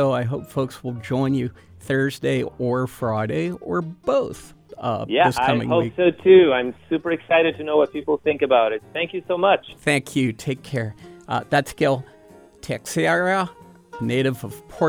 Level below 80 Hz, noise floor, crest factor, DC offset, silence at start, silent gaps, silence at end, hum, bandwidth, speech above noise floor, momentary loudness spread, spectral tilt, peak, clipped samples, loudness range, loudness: -54 dBFS; -48 dBFS; 18 dB; under 0.1%; 0 s; none; 0 s; none; 18.5 kHz; 27 dB; 11 LU; -6 dB/octave; -2 dBFS; under 0.1%; 6 LU; -21 LUFS